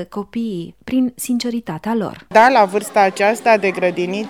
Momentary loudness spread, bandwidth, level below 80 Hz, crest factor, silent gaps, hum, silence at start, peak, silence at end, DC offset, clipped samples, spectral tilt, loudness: 12 LU; 17.5 kHz; -58 dBFS; 16 dB; none; none; 0 s; -2 dBFS; 0 s; 0.2%; under 0.1%; -4.5 dB/octave; -17 LUFS